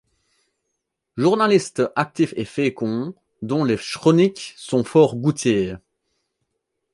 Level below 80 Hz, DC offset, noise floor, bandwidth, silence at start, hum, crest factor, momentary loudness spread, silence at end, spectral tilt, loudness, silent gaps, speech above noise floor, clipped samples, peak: -58 dBFS; under 0.1%; -78 dBFS; 11.5 kHz; 1.15 s; none; 18 dB; 13 LU; 1.15 s; -6 dB/octave; -20 LUFS; none; 58 dB; under 0.1%; -2 dBFS